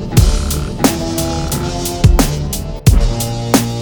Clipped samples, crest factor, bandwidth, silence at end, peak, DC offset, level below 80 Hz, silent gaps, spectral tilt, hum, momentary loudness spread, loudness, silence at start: 0.2%; 14 dB; over 20 kHz; 0 s; 0 dBFS; under 0.1%; -18 dBFS; none; -5 dB/octave; none; 7 LU; -15 LUFS; 0 s